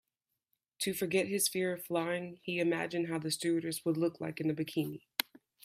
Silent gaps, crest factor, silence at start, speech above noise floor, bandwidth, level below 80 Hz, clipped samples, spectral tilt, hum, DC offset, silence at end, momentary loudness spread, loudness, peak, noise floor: none; 24 dB; 0.8 s; 54 dB; 16 kHz; -78 dBFS; under 0.1%; -4 dB/octave; none; under 0.1%; 0.4 s; 6 LU; -34 LUFS; -10 dBFS; -88 dBFS